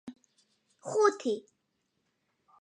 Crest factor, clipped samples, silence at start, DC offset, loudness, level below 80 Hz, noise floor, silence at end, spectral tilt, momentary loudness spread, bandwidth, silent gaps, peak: 22 dB; under 0.1%; 0.05 s; under 0.1%; -30 LUFS; -88 dBFS; -79 dBFS; 1.2 s; -3.5 dB/octave; 20 LU; 10.5 kHz; none; -12 dBFS